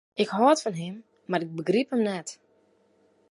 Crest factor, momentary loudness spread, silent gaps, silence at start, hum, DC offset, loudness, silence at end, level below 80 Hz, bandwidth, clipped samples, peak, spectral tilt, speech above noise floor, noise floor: 20 dB; 16 LU; none; 0.15 s; none; under 0.1%; -26 LUFS; 0.95 s; -78 dBFS; 11.5 kHz; under 0.1%; -8 dBFS; -5 dB/octave; 39 dB; -65 dBFS